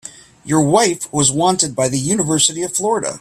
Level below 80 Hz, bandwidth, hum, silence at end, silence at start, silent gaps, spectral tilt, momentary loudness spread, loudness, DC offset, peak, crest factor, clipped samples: -52 dBFS; 15 kHz; none; 0 s; 0.05 s; none; -3.5 dB/octave; 6 LU; -15 LUFS; under 0.1%; 0 dBFS; 16 dB; under 0.1%